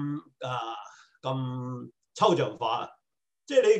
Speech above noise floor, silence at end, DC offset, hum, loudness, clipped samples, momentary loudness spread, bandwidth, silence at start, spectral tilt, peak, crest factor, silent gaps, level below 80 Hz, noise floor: 57 dB; 0 s; under 0.1%; none; -30 LUFS; under 0.1%; 18 LU; 9 kHz; 0 s; -5.5 dB/octave; -8 dBFS; 22 dB; none; -78 dBFS; -83 dBFS